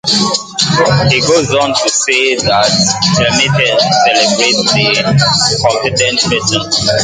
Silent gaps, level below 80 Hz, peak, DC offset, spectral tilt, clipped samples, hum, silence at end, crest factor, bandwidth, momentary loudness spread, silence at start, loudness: none; -40 dBFS; 0 dBFS; under 0.1%; -3 dB/octave; under 0.1%; none; 0 s; 12 dB; 9.6 kHz; 3 LU; 0.05 s; -10 LUFS